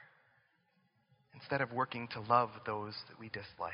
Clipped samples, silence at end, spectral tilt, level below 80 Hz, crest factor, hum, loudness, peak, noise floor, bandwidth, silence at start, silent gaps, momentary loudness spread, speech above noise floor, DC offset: under 0.1%; 0 s; -3.5 dB/octave; -74 dBFS; 26 dB; none; -37 LUFS; -14 dBFS; -75 dBFS; 5.4 kHz; 0 s; none; 15 LU; 38 dB; under 0.1%